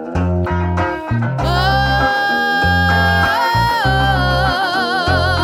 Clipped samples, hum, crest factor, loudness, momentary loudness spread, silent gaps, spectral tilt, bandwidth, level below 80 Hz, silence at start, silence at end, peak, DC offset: under 0.1%; none; 14 dB; -15 LUFS; 5 LU; none; -5.5 dB/octave; 17.5 kHz; -26 dBFS; 0 s; 0 s; -2 dBFS; under 0.1%